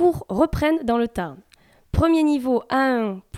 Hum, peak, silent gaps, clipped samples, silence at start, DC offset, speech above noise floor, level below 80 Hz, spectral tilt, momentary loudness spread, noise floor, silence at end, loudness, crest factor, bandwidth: none; -6 dBFS; none; under 0.1%; 0 s; under 0.1%; 21 dB; -38 dBFS; -7 dB/octave; 8 LU; -42 dBFS; 0 s; -21 LUFS; 16 dB; 14.5 kHz